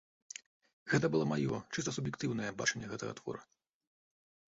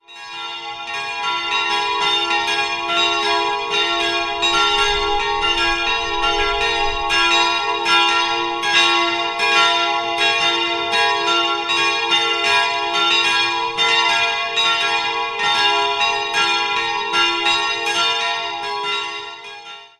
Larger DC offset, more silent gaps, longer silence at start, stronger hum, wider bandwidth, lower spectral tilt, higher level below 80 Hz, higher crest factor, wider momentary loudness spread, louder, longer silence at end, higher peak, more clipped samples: neither; neither; first, 0.85 s vs 0.1 s; neither; second, 8 kHz vs 14 kHz; first, -5 dB/octave vs -1 dB/octave; second, -68 dBFS vs -44 dBFS; first, 22 dB vs 16 dB; first, 17 LU vs 8 LU; second, -36 LUFS vs -16 LUFS; first, 1.1 s vs 0.15 s; second, -16 dBFS vs -2 dBFS; neither